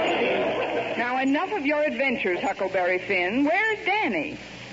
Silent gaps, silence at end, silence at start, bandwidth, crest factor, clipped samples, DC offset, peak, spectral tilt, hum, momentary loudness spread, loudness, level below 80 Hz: none; 0 s; 0 s; 7.8 kHz; 12 dB; under 0.1%; under 0.1%; -12 dBFS; -5 dB/octave; none; 4 LU; -24 LUFS; -60 dBFS